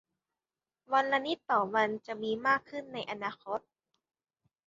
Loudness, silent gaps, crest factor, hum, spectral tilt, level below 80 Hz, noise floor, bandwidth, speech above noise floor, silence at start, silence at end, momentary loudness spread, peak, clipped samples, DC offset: -32 LUFS; none; 20 dB; none; -1.5 dB/octave; -78 dBFS; under -90 dBFS; 7.4 kHz; over 58 dB; 0.9 s; 1.1 s; 11 LU; -14 dBFS; under 0.1%; under 0.1%